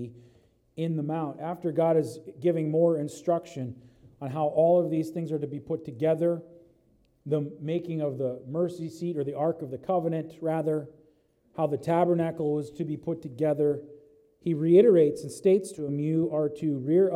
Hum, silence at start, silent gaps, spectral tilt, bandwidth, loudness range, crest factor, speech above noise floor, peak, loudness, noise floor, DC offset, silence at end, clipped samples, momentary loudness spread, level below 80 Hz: none; 0 s; none; -8.5 dB/octave; 13 kHz; 6 LU; 18 dB; 38 dB; -8 dBFS; -28 LUFS; -65 dBFS; under 0.1%; 0 s; under 0.1%; 12 LU; -70 dBFS